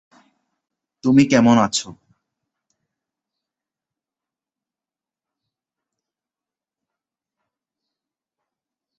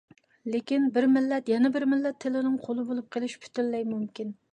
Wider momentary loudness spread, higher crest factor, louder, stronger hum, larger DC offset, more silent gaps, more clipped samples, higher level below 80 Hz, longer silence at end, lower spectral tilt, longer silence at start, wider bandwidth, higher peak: about the same, 12 LU vs 10 LU; first, 22 dB vs 14 dB; first, -16 LUFS vs -28 LUFS; neither; neither; neither; neither; first, -60 dBFS vs -78 dBFS; first, 7.05 s vs 0.2 s; about the same, -5 dB/octave vs -6 dB/octave; first, 1.05 s vs 0.45 s; about the same, 8.4 kHz vs 9.2 kHz; first, -2 dBFS vs -14 dBFS